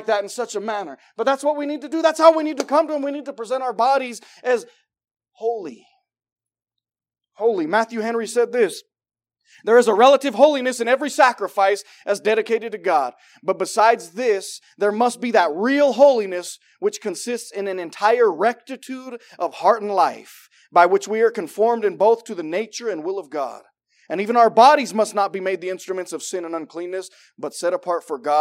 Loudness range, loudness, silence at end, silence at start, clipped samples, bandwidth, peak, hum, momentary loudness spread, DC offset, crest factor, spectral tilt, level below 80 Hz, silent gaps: 7 LU; -20 LUFS; 0 s; 0 s; under 0.1%; 16 kHz; 0 dBFS; none; 15 LU; under 0.1%; 20 dB; -3.5 dB/octave; under -90 dBFS; 6.32-6.36 s